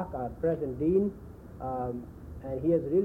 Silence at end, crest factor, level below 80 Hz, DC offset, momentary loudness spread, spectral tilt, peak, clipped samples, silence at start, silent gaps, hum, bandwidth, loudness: 0 s; 16 dB; -50 dBFS; under 0.1%; 17 LU; -11 dB/octave; -16 dBFS; under 0.1%; 0 s; none; none; 3.7 kHz; -31 LUFS